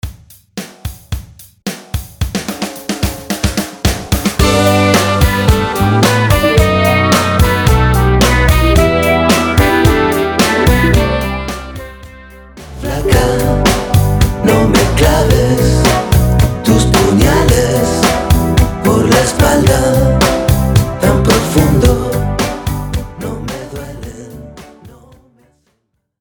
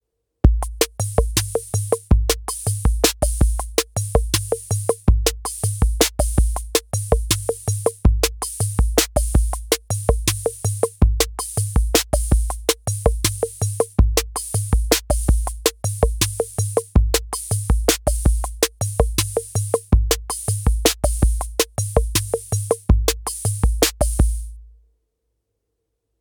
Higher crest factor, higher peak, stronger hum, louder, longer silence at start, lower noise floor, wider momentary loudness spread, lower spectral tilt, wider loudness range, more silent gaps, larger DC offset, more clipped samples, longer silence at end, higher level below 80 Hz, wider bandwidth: second, 12 dB vs 20 dB; about the same, 0 dBFS vs 0 dBFS; neither; first, -11 LUFS vs -20 LUFS; second, 0.05 s vs 0.45 s; second, -65 dBFS vs -76 dBFS; first, 15 LU vs 5 LU; first, -5.5 dB/octave vs -4 dB/octave; first, 9 LU vs 0 LU; neither; neither; neither; second, 1.3 s vs 1.5 s; about the same, -20 dBFS vs -22 dBFS; about the same, over 20 kHz vs over 20 kHz